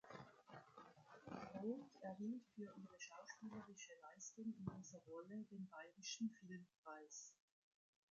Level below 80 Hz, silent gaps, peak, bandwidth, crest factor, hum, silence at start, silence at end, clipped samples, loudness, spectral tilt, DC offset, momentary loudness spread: -86 dBFS; 6.78-6.84 s; -34 dBFS; 8 kHz; 20 dB; none; 0.05 s; 0.8 s; under 0.1%; -55 LUFS; -5 dB/octave; under 0.1%; 13 LU